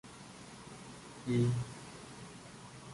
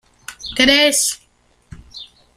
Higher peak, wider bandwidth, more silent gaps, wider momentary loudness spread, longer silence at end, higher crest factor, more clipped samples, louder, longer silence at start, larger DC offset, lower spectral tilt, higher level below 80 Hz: second, -20 dBFS vs 0 dBFS; second, 11.5 kHz vs 15.5 kHz; neither; second, 19 LU vs 25 LU; second, 0 s vs 0.3 s; about the same, 20 dB vs 20 dB; neither; second, -37 LUFS vs -14 LUFS; second, 0.05 s vs 0.3 s; neither; first, -6.5 dB/octave vs -0.5 dB/octave; second, -64 dBFS vs -46 dBFS